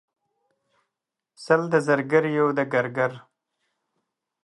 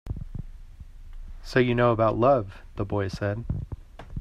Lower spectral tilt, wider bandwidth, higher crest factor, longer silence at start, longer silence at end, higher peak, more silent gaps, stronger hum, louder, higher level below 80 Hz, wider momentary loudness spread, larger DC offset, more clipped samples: second, -6.5 dB/octave vs -8 dB/octave; about the same, 11.5 kHz vs 10.5 kHz; about the same, 20 dB vs 20 dB; first, 1.4 s vs 0.05 s; first, 1.25 s vs 0 s; first, -4 dBFS vs -8 dBFS; neither; neither; about the same, -23 LUFS vs -25 LUFS; second, -76 dBFS vs -40 dBFS; second, 5 LU vs 20 LU; neither; neither